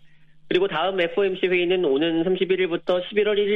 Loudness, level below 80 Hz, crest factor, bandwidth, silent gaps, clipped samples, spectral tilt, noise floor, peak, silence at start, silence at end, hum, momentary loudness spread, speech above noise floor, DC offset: -22 LUFS; -60 dBFS; 14 dB; 5.4 kHz; none; under 0.1%; -7.5 dB/octave; -47 dBFS; -8 dBFS; 0.05 s; 0 s; none; 3 LU; 26 dB; under 0.1%